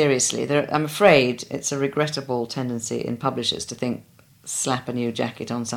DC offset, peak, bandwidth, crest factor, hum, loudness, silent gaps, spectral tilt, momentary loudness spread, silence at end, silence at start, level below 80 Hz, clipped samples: under 0.1%; -2 dBFS; 17 kHz; 22 dB; none; -23 LUFS; none; -4 dB/octave; 11 LU; 0 s; 0 s; -60 dBFS; under 0.1%